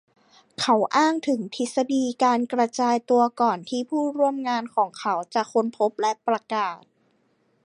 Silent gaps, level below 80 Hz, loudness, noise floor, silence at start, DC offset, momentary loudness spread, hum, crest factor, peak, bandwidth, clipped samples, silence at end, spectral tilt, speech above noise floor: none; -78 dBFS; -24 LUFS; -66 dBFS; 0.6 s; under 0.1%; 7 LU; none; 18 dB; -6 dBFS; 11 kHz; under 0.1%; 0.9 s; -4 dB/octave; 43 dB